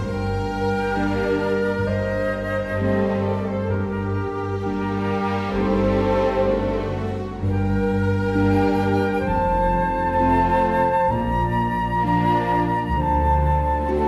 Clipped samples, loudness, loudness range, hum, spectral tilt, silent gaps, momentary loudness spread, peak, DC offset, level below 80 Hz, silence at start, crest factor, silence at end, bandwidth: under 0.1%; -21 LUFS; 3 LU; none; -8 dB/octave; none; 6 LU; -6 dBFS; under 0.1%; -32 dBFS; 0 s; 14 dB; 0 s; 12 kHz